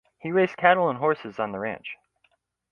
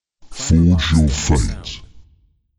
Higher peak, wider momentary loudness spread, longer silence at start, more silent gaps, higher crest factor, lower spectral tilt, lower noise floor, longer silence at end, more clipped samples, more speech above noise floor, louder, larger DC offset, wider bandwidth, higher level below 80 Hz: about the same, -2 dBFS vs -2 dBFS; about the same, 17 LU vs 19 LU; about the same, 0.25 s vs 0.25 s; neither; first, 24 dB vs 16 dB; first, -7.5 dB/octave vs -5.5 dB/octave; first, -69 dBFS vs -56 dBFS; first, 0.8 s vs 0.55 s; neither; first, 45 dB vs 41 dB; second, -24 LUFS vs -16 LUFS; neither; second, 6.8 kHz vs 11.5 kHz; second, -68 dBFS vs -26 dBFS